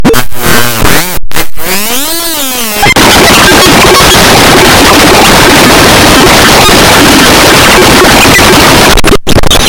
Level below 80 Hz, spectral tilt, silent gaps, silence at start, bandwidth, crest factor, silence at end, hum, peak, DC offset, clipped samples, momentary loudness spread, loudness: -16 dBFS; -3 dB/octave; none; 0 s; over 20 kHz; 2 dB; 0 s; none; 0 dBFS; under 0.1%; 20%; 8 LU; -2 LUFS